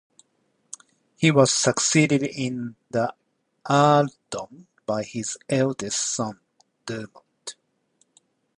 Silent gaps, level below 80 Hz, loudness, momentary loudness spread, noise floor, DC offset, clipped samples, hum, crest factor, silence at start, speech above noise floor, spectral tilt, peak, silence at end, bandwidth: none; -66 dBFS; -23 LUFS; 23 LU; -70 dBFS; under 0.1%; under 0.1%; none; 22 dB; 1.2 s; 47 dB; -4 dB/octave; -4 dBFS; 1.05 s; 11 kHz